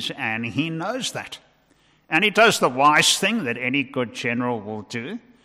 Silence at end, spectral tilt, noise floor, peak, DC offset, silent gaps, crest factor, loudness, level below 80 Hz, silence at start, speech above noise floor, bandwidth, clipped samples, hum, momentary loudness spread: 0.25 s; -3 dB/octave; -60 dBFS; -6 dBFS; under 0.1%; none; 18 dB; -21 LUFS; -66 dBFS; 0 s; 38 dB; 16 kHz; under 0.1%; none; 16 LU